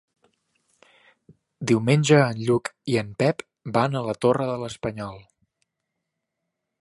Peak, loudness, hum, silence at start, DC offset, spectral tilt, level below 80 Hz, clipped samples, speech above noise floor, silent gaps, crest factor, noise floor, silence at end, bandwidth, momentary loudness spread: -4 dBFS; -23 LUFS; none; 1.6 s; under 0.1%; -6 dB/octave; -60 dBFS; under 0.1%; 59 dB; none; 22 dB; -81 dBFS; 1.6 s; 11.5 kHz; 14 LU